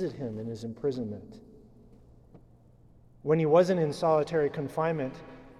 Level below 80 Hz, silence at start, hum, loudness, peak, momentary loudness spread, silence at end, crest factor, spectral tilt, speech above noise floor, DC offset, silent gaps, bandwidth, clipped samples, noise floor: -60 dBFS; 0 s; none; -29 LUFS; -10 dBFS; 16 LU; 0.1 s; 20 dB; -7.5 dB/octave; 29 dB; under 0.1%; none; 12.5 kHz; under 0.1%; -57 dBFS